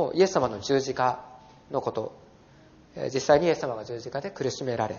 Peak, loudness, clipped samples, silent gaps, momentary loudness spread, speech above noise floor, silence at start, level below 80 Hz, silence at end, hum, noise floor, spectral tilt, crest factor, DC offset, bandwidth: -6 dBFS; -27 LUFS; under 0.1%; none; 13 LU; 28 dB; 0 s; -60 dBFS; 0 s; none; -54 dBFS; -4.5 dB/octave; 22 dB; under 0.1%; 7.2 kHz